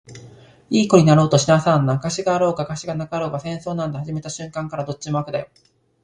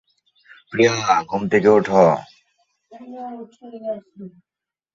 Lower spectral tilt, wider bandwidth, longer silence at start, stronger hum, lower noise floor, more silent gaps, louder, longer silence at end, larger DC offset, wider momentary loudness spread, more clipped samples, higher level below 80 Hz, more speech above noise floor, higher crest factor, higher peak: about the same, -6 dB/octave vs -5.5 dB/octave; first, 10 kHz vs 7.6 kHz; second, 0.1 s vs 0.7 s; neither; second, -45 dBFS vs -67 dBFS; neither; about the same, -20 LUFS vs -18 LUFS; about the same, 0.6 s vs 0.65 s; neither; second, 14 LU vs 24 LU; neither; first, -52 dBFS vs -60 dBFS; second, 26 dB vs 48 dB; about the same, 18 dB vs 20 dB; about the same, -2 dBFS vs -2 dBFS